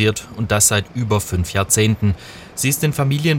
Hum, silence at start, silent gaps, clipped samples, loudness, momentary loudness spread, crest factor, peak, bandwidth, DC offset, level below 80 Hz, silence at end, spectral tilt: none; 0 s; none; under 0.1%; -18 LUFS; 8 LU; 18 dB; 0 dBFS; 17 kHz; under 0.1%; -42 dBFS; 0 s; -4 dB/octave